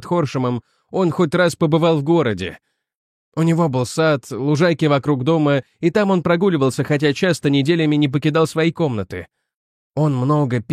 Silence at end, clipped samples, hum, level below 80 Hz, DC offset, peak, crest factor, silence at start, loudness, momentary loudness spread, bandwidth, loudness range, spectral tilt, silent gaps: 0 s; under 0.1%; none; -56 dBFS; under 0.1%; -2 dBFS; 16 dB; 0 s; -18 LUFS; 7 LU; 14 kHz; 2 LU; -6.5 dB/octave; 2.95-3.32 s, 9.56-9.90 s